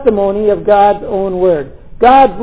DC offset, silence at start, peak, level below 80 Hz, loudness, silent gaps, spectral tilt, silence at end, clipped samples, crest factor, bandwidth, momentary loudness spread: 2%; 0 s; 0 dBFS; -36 dBFS; -11 LUFS; none; -10 dB/octave; 0 s; 0.8%; 10 dB; 4 kHz; 10 LU